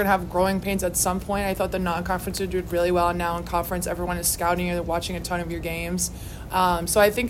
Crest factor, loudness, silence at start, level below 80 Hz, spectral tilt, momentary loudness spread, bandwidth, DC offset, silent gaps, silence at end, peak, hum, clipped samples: 18 dB; -24 LUFS; 0 s; -38 dBFS; -4 dB/octave; 7 LU; 16.5 kHz; under 0.1%; none; 0 s; -6 dBFS; none; under 0.1%